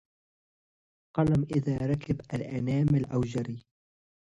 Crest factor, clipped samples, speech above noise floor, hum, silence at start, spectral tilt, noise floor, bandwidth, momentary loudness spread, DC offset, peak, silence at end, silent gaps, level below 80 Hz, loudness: 18 dB; under 0.1%; over 62 dB; none; 1.15 s; -9 dB/octave; under -90 dBFS; 9.6 kHz; 9 LU; under 0.1%; -12 dBFS; 0.65 s; none; -52 dBFS; -29 LUFS